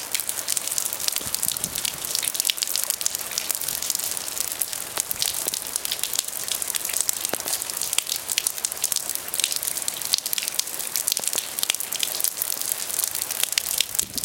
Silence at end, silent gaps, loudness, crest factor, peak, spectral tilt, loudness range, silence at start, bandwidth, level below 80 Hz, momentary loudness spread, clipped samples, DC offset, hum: 0 s; none; -24 LUFS; 26 dB; 0 dBFS; 1.5 dB/octave; 1 LU; 0 s; over 20 kHz; -60 dBFS; 4 LU; under 0.1%; under 0.1%; none